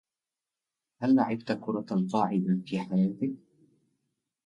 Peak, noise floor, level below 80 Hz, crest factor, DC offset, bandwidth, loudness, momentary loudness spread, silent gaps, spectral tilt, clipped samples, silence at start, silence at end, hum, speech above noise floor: -12 dBFS; under -90 dBFS; -74 dBFS; 18 dB; under 0.1%; 7.6 kHz; -29 LUFS; 9 LU; none; -8.5 dB/octave; under 0.1%; 1 s; 1.1 s; none; over 62 dB